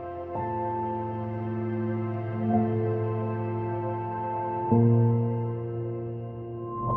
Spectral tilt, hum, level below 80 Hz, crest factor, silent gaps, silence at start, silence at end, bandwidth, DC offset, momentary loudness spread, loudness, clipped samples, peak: -12.5 dB/octave; none; -58 dBFS; 18 dB; none; 0 s; 0 s; 3.3 kHz; under 0.1%; 11 LU; -29 LUFS; under 0.1%; -8 dBFS